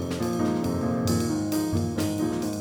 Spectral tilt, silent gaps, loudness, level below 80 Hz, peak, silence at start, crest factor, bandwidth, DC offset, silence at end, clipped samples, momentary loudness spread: -6 dB/octave; none; -26 LUFS; -48 dBFS; -12 dBFS; 0 s; 14 dB; over 20 kHz; under 0.1%; 0 s; under 0.1%; 2 LU